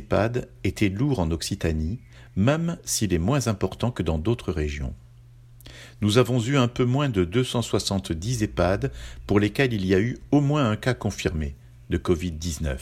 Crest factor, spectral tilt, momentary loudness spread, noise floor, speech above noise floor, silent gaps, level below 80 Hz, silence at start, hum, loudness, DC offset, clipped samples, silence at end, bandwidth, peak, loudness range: 20 dB; -5.5 dB/octave; 9 LU; -49 dBFS; 25 dB; none; -38 dBFS; 0 s; none; -25 LUFS; under 0.1%; under 0.1%; 0 s; 16 kHz; -4 dBFS; 3 LU